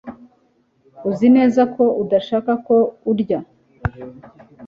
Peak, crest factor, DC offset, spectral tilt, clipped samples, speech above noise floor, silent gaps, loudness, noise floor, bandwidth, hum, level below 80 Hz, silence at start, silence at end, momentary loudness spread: -4 dBFS; 14 dB; under 0.1%; -8 dB/octave; under 0.1%; 44 dB; none; -18 LUFS; -60 dBFS; 6.8 kHz; none; -46 dBFS; 0.05 s; 0 s; 15 LU